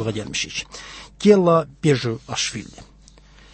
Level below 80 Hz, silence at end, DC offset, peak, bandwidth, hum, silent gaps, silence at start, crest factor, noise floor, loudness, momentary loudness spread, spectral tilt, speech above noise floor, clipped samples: -50 dBFS; 0.7 s; under 0.1%; -2 dBFS; 8.8 kHz; none; none; 0 s; 18 dB; -48 dBFS; -20 LUFS; 20 LU; -5 dB/octave; 28 dB; under 0.1%